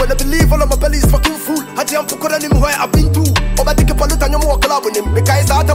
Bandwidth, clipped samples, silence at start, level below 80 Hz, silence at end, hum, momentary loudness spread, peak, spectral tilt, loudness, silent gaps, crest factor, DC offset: 16.5 kHz; under 0.1%; 0 s; -16 dBFS; 0 s; none; 5 LU; 0 dBFS; -5 dB/octave; -14 LUFS; none; 12 dB; under 0.1%